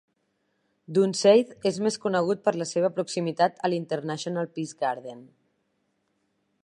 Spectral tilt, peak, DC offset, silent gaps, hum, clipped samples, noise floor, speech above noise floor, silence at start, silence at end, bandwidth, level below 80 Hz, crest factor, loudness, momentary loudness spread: -5 dB/octave; -6 dBFS; under 0.1%; none; none; under 0.1%; -74 dBFS; 49 dB; 0.9 s; 1.4 s; 11.5 kHz; -76 dBFS; 20 dB; -26 LUFS; 11 LU